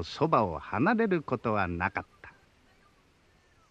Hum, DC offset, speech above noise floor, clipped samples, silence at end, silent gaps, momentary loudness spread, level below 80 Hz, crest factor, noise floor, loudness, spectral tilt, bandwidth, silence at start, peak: none; under 0.1%; 35 dB; under 0.1%; 1.4 s; none; 6 LU; -58 dBFS; 20 dB; -64 dBFS; -29 LUFS; -7.5 dB/octave; 8.6 kHz; 0 s; -10 dBFS